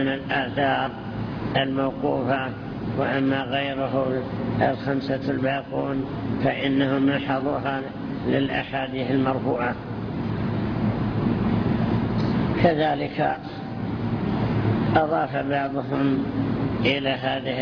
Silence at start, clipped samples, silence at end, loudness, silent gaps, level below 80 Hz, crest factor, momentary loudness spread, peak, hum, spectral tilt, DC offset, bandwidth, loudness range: 0 s; under 0.1%; 0 s; -24 LUFS; none; -44 dBFS; 18 dB; 7 LU; -6 dBFS; none; -9 dB/octave; under 0.1%; 5.4 kHz; 2 LU